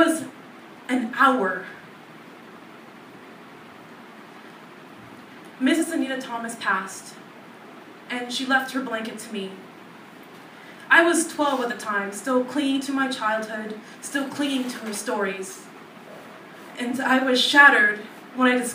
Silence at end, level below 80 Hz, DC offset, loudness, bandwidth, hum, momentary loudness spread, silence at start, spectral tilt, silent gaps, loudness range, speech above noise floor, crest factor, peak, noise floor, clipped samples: 0 s; -82 dBFS; under 0.1%; -22 LUFS; 15.5 kHz; none; 25 LU; 0 s; -2.5 dB/octave; none; 11 LU; 22 dB; 24 dB; 0 dBFS; -44 dBFS; under 0.1%